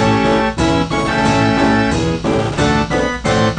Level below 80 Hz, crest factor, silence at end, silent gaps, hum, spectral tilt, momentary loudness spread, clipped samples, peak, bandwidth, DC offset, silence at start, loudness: -30 dBFS; 14 dB; 0 s; none; none; -5.5 dB/octave; 4 LU; under 0.1%; -2 dBFS; 9.8 kHz; under 0.1%; 0 s; -15 LUFS